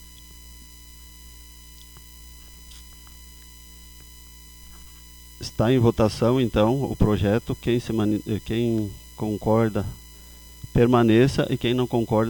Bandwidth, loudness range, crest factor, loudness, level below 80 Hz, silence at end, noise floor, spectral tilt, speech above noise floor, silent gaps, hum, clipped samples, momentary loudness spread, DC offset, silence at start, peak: over 20 kHz; 22 LU; 20 dB; -22 LUFS; -40 dBFS; 0 s; -45 dBFS; -7 dB/octave; 24 dB; none; 60 Hz at -45 dBFS; under 0.1%; 25 LU; under 0.1%; 0.05 s; -6 dBFS